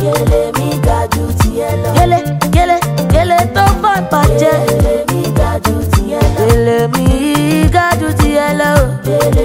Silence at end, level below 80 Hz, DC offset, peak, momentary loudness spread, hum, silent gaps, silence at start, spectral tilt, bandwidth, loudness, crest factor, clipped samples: 0 s; -20 dBFS; under 0.1%; 0 dBFS; 4 LU; none; none; 0 s; -6 dB/octave; 16.5 kHz; -12 LUFS; 10 dB; 0.3%